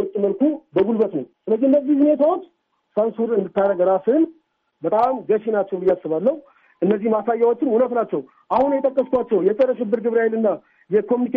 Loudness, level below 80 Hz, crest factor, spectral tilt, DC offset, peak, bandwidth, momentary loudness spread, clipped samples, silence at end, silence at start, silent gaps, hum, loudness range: -20 LUFS; -62 dBFS; 12 dB; -7 dB/octave; under 0.1%; -8 dBFS; 4.7 kHz; 6 LU; under 0.1%; 0 s; 0 s; none; none; 2 LU